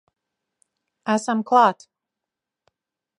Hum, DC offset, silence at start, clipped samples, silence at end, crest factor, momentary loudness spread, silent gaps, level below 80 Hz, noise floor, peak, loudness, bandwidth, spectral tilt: none; under 0.1%; 1.05 s; under 0.1%; 1.45 s; 22 dB; 16 LU; none; -80 dBFS; -86 dBFS; -2 dBFS; -20 LUFS; 11 kHz; -4.5 dB/octave